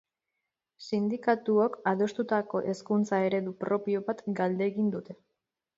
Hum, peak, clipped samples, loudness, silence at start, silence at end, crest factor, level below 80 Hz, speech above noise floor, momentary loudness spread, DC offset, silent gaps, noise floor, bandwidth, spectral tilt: none; -12 dBFS; under 0.1%; -29 LUFS; 0.8 s; 0.65 s; 18 dB; -76 dBFS; 57 dB; 7 LU; under 0.1%; none; -85 dBFS; 7.8 kHz; -7 dB/octave